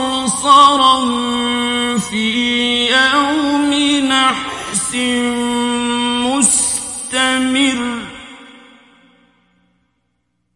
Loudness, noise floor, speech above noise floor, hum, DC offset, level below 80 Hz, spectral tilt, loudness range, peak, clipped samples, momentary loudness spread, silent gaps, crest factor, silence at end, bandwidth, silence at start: -14 LUFS; -68 dBFS; 54 dB; 60 Hz at -55 dBFS; under 0.1%; -50 dBFS; -1.5 dB/octave; 7 LU; 0 dBFS; under 0.1%; 9 LU; none; 16 dB; 2.05 s; 11.5 kHz; 0 s